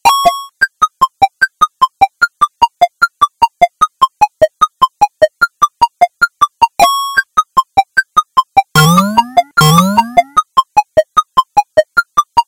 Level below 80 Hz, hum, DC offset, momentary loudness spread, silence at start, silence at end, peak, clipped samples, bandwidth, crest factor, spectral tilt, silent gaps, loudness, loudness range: -42 dBFS; none; under 0.1%; 4 LU; 0.05 s; 0.05 s; 0 dBFS; 1%; 17.5 kHz; 12 dB; -4 dB/octave; none; -12 LUFS; 2 LU